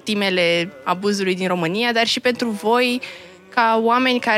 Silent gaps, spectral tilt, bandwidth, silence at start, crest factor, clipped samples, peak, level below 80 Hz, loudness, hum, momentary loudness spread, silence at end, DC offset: none; -4 dB/octave; 15.5 kHz; 0.05 s; 16 dB; under 0.1%; -4 dBFS; -70 dBFS; -19 LUFS; none; 7 LU; 0 s; under 0.1%